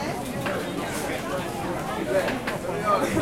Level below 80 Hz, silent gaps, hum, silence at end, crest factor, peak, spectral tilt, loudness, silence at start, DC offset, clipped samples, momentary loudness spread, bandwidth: -48 dBFS; none; none; 0 s; 18 dB; -10 dBFS; -5 dB/octave; -27 LUFS; 0 s; under 0.1%; under 0.1%; 6 LU; 16.5 kHz